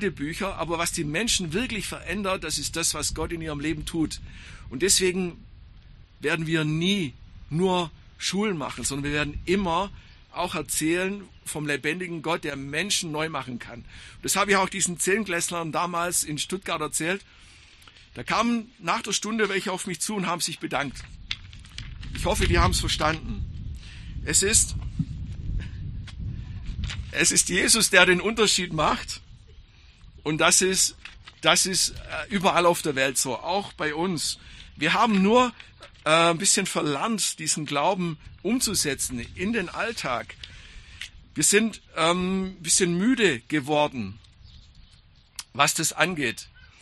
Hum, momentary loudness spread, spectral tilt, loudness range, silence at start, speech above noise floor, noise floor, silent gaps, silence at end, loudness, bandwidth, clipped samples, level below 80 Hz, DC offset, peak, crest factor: none; 17 LU; -3 dB/octave; 6 LU; 0 s; 30 dB; -55 dBFS; none; 0.15 s; -24 LUFS; 13 kHz; under 0.1%; -42 dBFS; under 0.1%; 0 dBFS; 26 dB